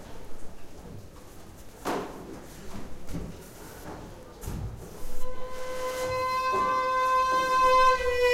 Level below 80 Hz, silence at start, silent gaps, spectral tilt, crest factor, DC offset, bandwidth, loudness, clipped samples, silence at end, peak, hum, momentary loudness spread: -42 dBFS; 0 s; none; -4 dB/octave; 16 dB; under 0.1%; 16 kHz; -26 LUFS; under 0.1%; 0 s; -12 dBFS; none; 25 LU